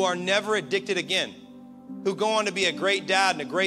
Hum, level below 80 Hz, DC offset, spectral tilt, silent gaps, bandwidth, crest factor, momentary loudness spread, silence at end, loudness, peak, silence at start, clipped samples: none; -72 dBFS; under 0.1%; -2.5 dB/octave; none; 14 kHz; 18 dB; 8 LU; 0 s; -24 LUFS; -8 dBFS; 0 s; under 0.1%